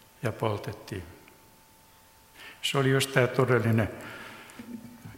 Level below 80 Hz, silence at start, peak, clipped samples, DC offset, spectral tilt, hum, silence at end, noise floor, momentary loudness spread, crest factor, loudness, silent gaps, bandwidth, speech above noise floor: -60 dBFS; 0.2 s; -6 dBFS; under 0.1%; under 0.1%; -5.5 dB/octave; none; 0 s; -57 dBFS; 20 LU; 24 dB; -27 LUFS; none; 16.5 kHz; 30 dB